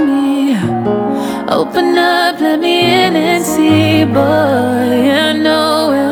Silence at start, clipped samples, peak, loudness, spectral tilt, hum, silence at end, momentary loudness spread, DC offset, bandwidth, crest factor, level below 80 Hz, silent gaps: 0 s; under 0.1%; 0 dBFS; -12 LUFS; -5 dB/octave; none; 0 s; 5 LU; under 0.1%; over 20 kHz; 12 dB; -50 dBFS; none